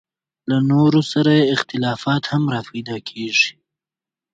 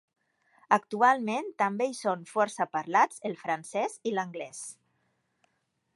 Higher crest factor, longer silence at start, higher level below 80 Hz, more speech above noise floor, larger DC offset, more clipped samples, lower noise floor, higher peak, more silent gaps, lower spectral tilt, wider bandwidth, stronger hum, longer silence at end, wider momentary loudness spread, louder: second, 16 dB vs 22 dB; second, 0.45 s vs 0.7 s; first, -58 dBFS vs -84 dBFS; first, 72 dB vs 49 dB; neither; neither; first, -89 dBFS vs -77 dBFS; first, -2 dBFS vs -8 dBFS; neither; first, -5.5 dB/octave vs -4 dB/octave; second, 8.8 kHz vs 11.5 kHz; neither; second, 0.8 s vs 1.25 s; about the same, 13 LU vs 13 LU; first, -18 LUFS vs -29 LUFS